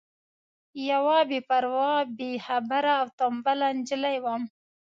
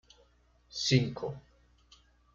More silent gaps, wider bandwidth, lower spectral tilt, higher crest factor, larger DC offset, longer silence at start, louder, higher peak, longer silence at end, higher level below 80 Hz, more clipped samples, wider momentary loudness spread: first, 3.13-3.18 s vs none; about the same, 7.8 kHz vs 7.6 kHz; about the same, -4 dB/octave vs -5 dB/octave; second, 14 dB vs 24 dB; neither; about the same, 0.75 s vs 0.75 s; first, -26 LUFS vs -31 LUFS; about the same, -12 dBFS vs -12 dBFS; second, 0.35 s vs 0.95 s; second, -78 dBFS vs -60 dBFS; neither; second, 11 LU vs 16 LU